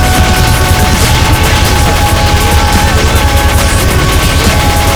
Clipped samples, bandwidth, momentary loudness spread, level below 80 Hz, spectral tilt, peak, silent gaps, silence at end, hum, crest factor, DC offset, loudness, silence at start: 0.9%; over 20 kHz; 1 LU; -12 dBFS; -4 dB/octave; 0 dBFS; none; 0 s; none; 8 dB; 1%; -8 LUFS; 0 s